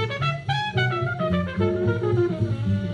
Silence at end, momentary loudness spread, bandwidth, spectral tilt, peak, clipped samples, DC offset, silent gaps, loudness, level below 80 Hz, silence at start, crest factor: 0 s; 3 LU; 9.4 kHz; -7.5 dB/octave; -10 dBFS; under 0.1%; under 0.1%; none; -24 LUFS; -48 dBFS; 0 s; 14 dB